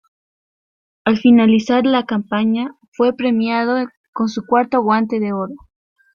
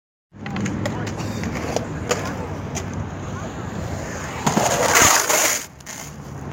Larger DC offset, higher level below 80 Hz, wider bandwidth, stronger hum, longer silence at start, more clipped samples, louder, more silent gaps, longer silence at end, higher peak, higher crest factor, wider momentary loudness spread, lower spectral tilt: neither; second, -58 dBFS vs -42 dBFS; second, 7 kHz vs 17 kHz; neither; first, 1.05 s vs 0.35 s; neither; first, -17 LUFS vs -21 LUFS; first, 2.88-2.92 s, 3.97-4.13 s vs none; first, 0.6 s vs 0 s; about the same, -2 dBFS vs -2 dBFS; second, 16 dB vs 22 dB; second, 11 LU vs 20 LU; first, -6.5 dB/octave vs -3 dB/octave